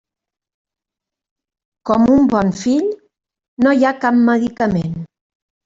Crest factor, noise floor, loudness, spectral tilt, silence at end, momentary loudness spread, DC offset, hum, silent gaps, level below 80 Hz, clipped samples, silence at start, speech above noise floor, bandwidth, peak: 14 dB; -85 dBFS; -15 LUFS; -7 dB/octave; 0.6 s; 13 LU; under 0.1%; none; 3.48-3.57 s; -48 dBFS; under 0.1%; 1.85 s; 71 dB; 7.8 kHz; -2 dBFS